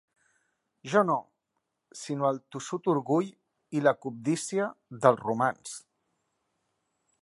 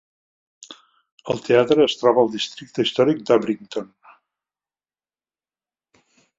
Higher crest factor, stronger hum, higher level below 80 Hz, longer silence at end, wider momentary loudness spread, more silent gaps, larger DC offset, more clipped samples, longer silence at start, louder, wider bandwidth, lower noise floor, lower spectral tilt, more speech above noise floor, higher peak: first, 26 dB vs 20 dB; neither; second, -80 dBFS vs -66 dBFS; second, 1.45 s vs 2.55 s; first, 16 LU vs 12 LU; second, none vs 1.12-1.18 s; neither; neither; first, 0.85 s vs 0.7 s; second, -29 LUFS vs -19 LUFS; first, 11.5 kHz vs 7.8 kHz; second, -82 dBFS vs under -90 dBFS; about the same, -5.5 dB/octave vs -5 dB/octave; second, 54 dB vs over 71 dB; second, -6 dBFS vs -2 dBFS